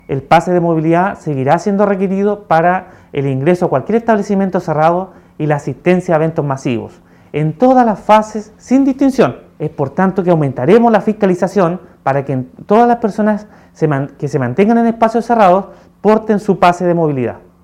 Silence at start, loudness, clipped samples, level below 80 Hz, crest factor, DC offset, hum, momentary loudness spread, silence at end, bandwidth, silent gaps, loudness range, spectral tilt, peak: 0.1 s; -13 LUFS; 0.2%; -48 dBFS; 12 dB; under 0.1%; none; 9 LU; 0.25 s; 12 kHz; none; 2 LU; -7.5 dB/octave; 0 dBFS